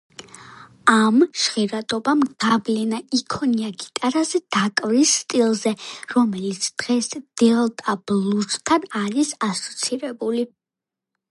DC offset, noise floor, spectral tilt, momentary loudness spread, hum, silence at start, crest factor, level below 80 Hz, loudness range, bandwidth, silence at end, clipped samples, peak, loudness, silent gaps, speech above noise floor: under 0.1%; -87 dBFS; -3.5 dB/octave; 8 LU; none; 0.4 s; 20 dB; -64 dBFS; 2 LU; 11.5 kHz; 0.85 s; under 0.1%; -2 dBFS; -21 LUFS; none; 66 dB